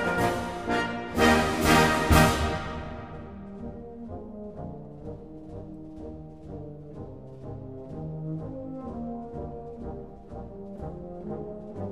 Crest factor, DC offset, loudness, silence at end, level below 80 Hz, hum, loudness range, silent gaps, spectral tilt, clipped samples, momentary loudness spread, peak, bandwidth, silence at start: 24 dB; 0.2%; -27 LUFS; 0 s; -40 dBFS; none; 17 LU; none; -5 dB/octave; under 0.1%; 21 LU; -4 dBFS; 15.5 kHz; 0 s